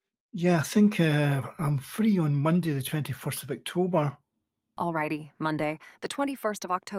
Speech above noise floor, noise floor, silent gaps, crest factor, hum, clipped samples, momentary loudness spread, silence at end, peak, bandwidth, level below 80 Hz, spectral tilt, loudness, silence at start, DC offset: 54 dB; -82 dBFS; none; 18 dB; none; under 0.1%; 10 LU; 0 s; -10 dBFS; 16 kHz; -66 dBFS; -6.5 dB/octave; -28 LUFS; 0.35 s; under 0.1%